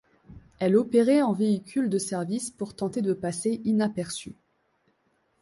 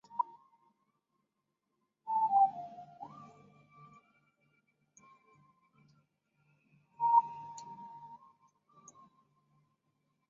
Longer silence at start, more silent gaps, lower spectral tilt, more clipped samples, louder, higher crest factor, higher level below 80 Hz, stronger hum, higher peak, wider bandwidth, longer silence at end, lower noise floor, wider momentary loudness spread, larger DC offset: first, 0.3 s vs 0.15 s; neither; first, -6 dB/octave vs -4.5 dB/octave; neither; first, -26 LUFS vs -31 LUFS; second, 18 dB vs 24 dB; first, -64 dBFS vs -90 dBFS; neither; first, -10 dBFS vs -14 dBFS; first, 11.5 kHz vs 7.4 kHz; second, 1.1 s vs 2.15 s; second, -70 dBFS vs -85 dBFS; second, 12 LU vs 23 LU; neither